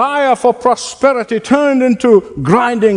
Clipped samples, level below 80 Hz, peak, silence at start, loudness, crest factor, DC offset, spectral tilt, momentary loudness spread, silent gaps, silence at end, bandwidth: 0.2%; -48 dBFS; 0 dBFS; 0 s; -12 LUFS; 12 dB; under 0.1%; -5.5 dB/octave; 4 LU; none; 0 s; 11 kHz